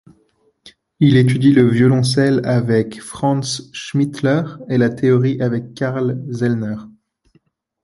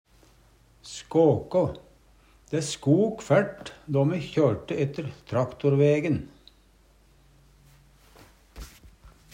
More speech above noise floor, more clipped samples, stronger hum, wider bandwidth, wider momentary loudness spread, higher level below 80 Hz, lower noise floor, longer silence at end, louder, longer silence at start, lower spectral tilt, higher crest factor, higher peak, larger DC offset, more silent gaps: first, 44 dB vs 35 dB; neither; neither; about the same, 11.5 kHz vs 11 kHz; second, 10 LU vs 21 LU; about the same, -52 dBFS vs -54 dBFS; about the same, -60 dBFS vs -59 dBFS; first, 0.95 s vs 0.25 s; first, -17 LUFS vs -25 LUFS; second, 0.65 s vs 0.85 s; about the same, -7 dB/octave vs -7 dB/octave; about the same, 16 dB vs 20 dB; first, 0 dBFS vs -8 dBFS; neither; neither